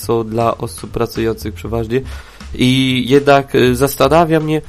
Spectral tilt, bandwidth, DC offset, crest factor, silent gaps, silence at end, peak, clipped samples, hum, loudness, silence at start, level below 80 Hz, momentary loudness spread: -5.5 dB/octave; 15.5 kHz; under 0.1%; 14 dB; none; 0 s; 0 dBFS; under 0.1%; none; -14 LUFS; 0 s; -34 dBFS; 13 LU